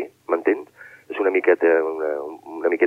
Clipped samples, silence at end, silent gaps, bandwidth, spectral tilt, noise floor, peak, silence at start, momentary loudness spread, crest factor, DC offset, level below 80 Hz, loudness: under 0.1%; 0 s; none; 4.5 kHz; -6 dB/octave; -43 dBFS; -6 dBFS; 0 s; 15 LU; 16 dB; under 0.1%; -78 dBFS; -21 LUFS